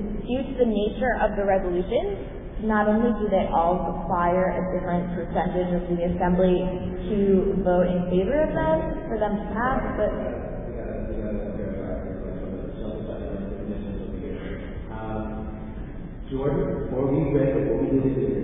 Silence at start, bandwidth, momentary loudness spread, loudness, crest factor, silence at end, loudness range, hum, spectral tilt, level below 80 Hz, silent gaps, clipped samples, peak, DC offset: 0 s; 3.8 kHz; 12 LU; -25 LUFS; 16 dB; 0 s; 10 LU; none; -12 dB/octave; -36 dBFS; none; under 0.1%; -8 dBFS; under 0.1%